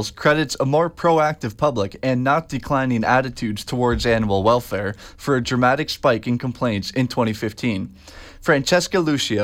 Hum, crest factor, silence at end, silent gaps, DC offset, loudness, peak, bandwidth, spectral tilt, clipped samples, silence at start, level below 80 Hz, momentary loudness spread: none; 16 dB; 0 s; none; under 0.1%; -20 LUFS; -4 dBFS; 16.5 kHz; -5.5 dB/octave; under 0.1%; 0 s; -42 dBFS; 7 LU